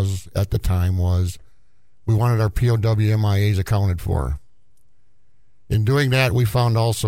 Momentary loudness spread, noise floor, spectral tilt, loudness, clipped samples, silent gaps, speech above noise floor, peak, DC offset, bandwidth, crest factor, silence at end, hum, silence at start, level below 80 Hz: 7 LU; -65 dBFS; -6.5 dB/octave; -20 LUFS; under 0.1%; none; 46 dB; -4 dBFS; 0.6%; 16 kHz; 16 dB; 0 s; none; 0 s; -34 dBFS